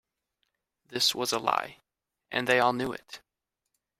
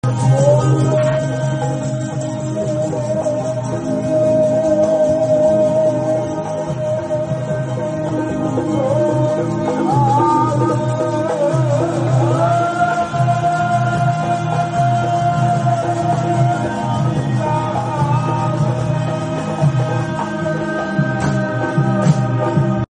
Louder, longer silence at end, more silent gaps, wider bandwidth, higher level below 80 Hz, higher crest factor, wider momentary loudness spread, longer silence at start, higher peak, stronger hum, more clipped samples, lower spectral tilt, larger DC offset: second, -27 LUFS vs -17 LUFS; first, 0.8 s vs 0.05 s; neither; first, 16 kHz vs 9.8 kHz; second, -68 dBFS vs -46 dBFS; first, 22 dB vs 14 dB; first, 19 LU vs 6 LU; first, 0.9 s vs 0.05 s; second, -8 dBFS vs -2 dBFS; neither; neither; second, -2.5 dB/octave vs -7.5 dB/octave; neither